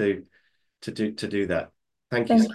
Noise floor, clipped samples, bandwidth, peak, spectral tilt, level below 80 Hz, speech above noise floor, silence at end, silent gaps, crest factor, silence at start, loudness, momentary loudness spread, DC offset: -67 dBFS; under 0.1%; 12 kHz; -8 dBFS; -6 dB/octave; -56 dBFS; 43 dB; 0 s; none; 18 dB; 0 s; -27 LUFS; 17 LU; under 0.1%